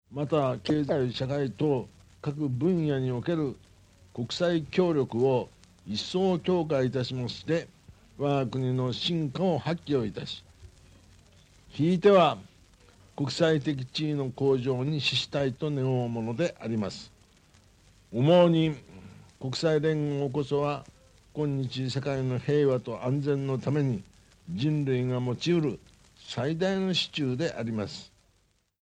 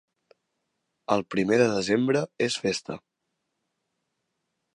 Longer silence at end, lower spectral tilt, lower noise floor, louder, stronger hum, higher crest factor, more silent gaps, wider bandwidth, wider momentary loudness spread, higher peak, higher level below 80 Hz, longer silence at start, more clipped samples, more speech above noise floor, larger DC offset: second, 0.75 s vs 1.75 s; first, -6.5 dB/octave vs -5 dB/octave; second, -69 dBFS vs -80 dBFS; second, -28 LUFS vs -25 LUFS; neither; about the same, 20 dB vs 22 dB; neither; second, 9.8 kHz vs 11 kHz; second, 11 LU vs 16 LU; about the same, -8 dBFS vs -8 dBFS; first, -60 dBFS vs -66 dBFS; second, 0.1 s vs 1.1 s; neither; second, 42 dB vs 56 dB; neither